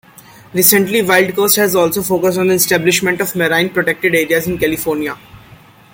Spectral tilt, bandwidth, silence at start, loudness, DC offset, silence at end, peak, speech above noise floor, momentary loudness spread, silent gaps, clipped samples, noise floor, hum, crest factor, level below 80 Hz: -3.5 dB/octave; 17 kHz; 0.55 s; -13 LUFS; under 0.1%; 0.55 s; 0 dBFS; 28 dB; 8 LU; none; under 0.1%; -42 dBFS; none; 14 dB; -48 dBFS